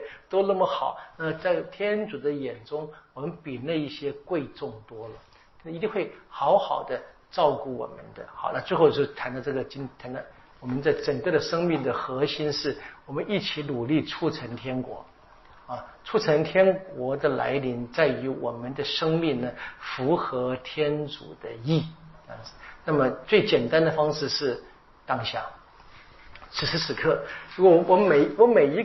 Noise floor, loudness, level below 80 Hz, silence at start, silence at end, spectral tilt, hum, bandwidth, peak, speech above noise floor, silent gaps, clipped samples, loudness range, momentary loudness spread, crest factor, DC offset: -53 dBFS; -26 LUFS; -58 dBFS; 0 s; 0 s; -4 dB/octave; none; 6 kHz; -6 dBFS; 27 dB; none; under 0.1%; 5 LU; 17 LU; 20 dB; under 0.1%